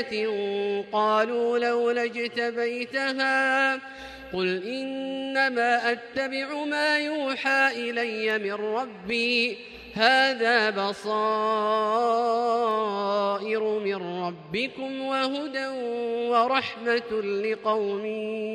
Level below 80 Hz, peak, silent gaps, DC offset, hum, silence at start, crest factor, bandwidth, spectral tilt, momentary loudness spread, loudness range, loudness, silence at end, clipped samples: -66 dBFS; -6 dBFS; none; under 0.1%; none; 0 s; 20 dB; 11.5 kHz; -4 dB/octave; 8 LU; 4 LU; -25 LUFS; 0 s; under 0.1%